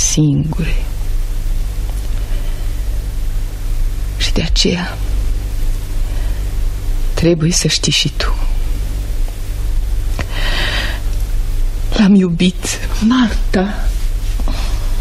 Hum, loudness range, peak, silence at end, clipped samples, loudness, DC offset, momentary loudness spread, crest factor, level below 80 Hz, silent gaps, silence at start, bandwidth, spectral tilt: none; 6 LU; 0 dBFS; 0 s; under 0.1%; -18 LUFS; under 0.1%; 11 LU; 14 dB; -16 dBFS; none; 0 s; 15 kHz; -4.5 dB/octave